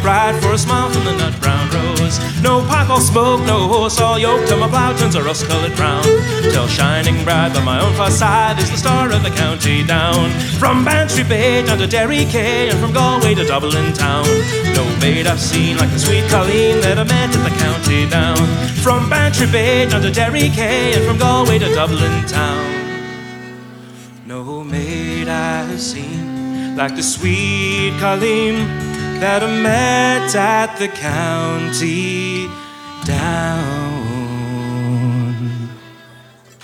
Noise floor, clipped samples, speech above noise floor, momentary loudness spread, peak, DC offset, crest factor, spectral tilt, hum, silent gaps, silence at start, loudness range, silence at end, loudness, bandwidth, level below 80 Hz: -43 dBFS; under 0.1%; 29 dB; 9 LU; 0 dBFS; under 0.1%; 14 dB; -4.5 dB/octave; none; none; 0 s; 7 LU; 0.45 s; -15 LUFS; 17.5 kHz; -36 dBFS